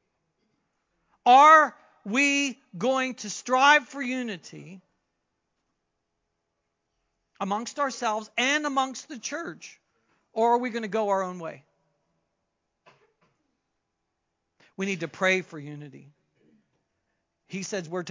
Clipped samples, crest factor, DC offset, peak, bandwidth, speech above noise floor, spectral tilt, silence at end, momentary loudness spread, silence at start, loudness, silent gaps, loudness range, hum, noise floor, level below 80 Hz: under 0.1%; 24 dB; under 0.1%; -4 dBFS; 7.6 kHz; 55 dB; -3 dB/octave; 0 s; 21 LU; 1.25 s; -24 LUFS; none; 17 LU; none; -80 dBFS; -84 dBFS